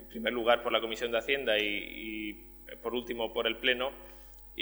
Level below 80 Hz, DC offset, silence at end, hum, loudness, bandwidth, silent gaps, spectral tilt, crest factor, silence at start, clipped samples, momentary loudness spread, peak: -56 dBFS; under 0.1%; 0 s; none; -31 LUFS; over 20 kHz; none; -3.5 dB/octave; 22 dB; 0 s; under 0.1%; 19 LU; -10 dBFS